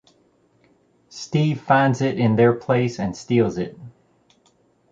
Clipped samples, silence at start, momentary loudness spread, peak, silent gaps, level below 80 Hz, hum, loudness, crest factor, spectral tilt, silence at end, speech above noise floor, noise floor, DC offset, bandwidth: under 0.1%; 1.15 s; 13 LU; -4 dBFS; none; -56 dBFS; none; -20 LUFS; 18 dB; -7 dB/octave; 1 s; 41 dB; -61 dBFS; under 0.1%; 7.8 kHz